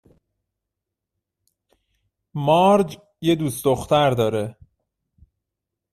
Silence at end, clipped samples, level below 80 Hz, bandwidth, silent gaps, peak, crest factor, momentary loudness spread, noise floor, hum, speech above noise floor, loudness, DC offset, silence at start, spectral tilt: 1.4 s; under 0.1%; -56 dBFS; 14 kHz; none; -6 dBFS; 18 dB; 12 LU; -84 dBFS; none; 65 dB; -20 LUFS; under 0.1%; 2.35 s; -6 dB/octave